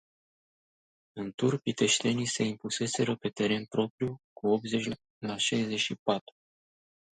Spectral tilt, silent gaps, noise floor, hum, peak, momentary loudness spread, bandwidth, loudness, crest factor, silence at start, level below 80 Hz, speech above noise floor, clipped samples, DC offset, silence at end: -4 dB/octave; 1.34-1.38 s, 3.90-3.98 s, 4.24-4.36 s, 5.10-5.21 s, 5.99-6.06 s; under -90 dBFS; none; -12 dBFS; 10 LU; 9.6 kHz; -30 LUFS; 20 dB; 1.15 s; -70 dBFS; over 60 dB; under 0.1%; under 0.1%; 1 s